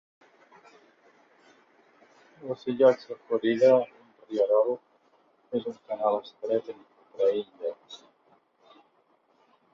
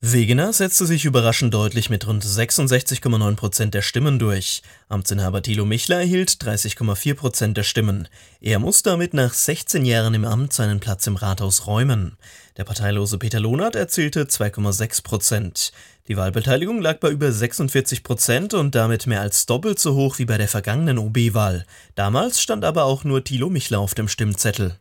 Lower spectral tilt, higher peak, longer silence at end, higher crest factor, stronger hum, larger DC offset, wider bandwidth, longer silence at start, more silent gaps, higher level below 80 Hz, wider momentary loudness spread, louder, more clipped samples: first, -6.5 dB/octave vs -4.5 dB/octave; second, -8 dBFS vs -2 dBFS; first, 1.75 s vs 0.05 s; about the same, 20 dB vs 18 dB; neither; neither; second, 7 kHz vs 17 kHz; first, 2.4 s vs 0 s; neither; second, -78 dBFS vs -50 dBFS; first, 21 LU vs 6 LU; second, -27 LUFS vs -19 LUFS; neither